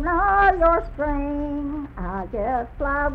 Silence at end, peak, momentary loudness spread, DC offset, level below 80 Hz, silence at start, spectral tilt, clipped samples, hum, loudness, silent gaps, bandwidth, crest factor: 0 s; -6 dBFS; 14 LU; under 0.1%; -32 dBFS; 0 s; -9 dB/octave; under 0.1%; none; -22 LUFS; none; 5.2 kHz; 16 dB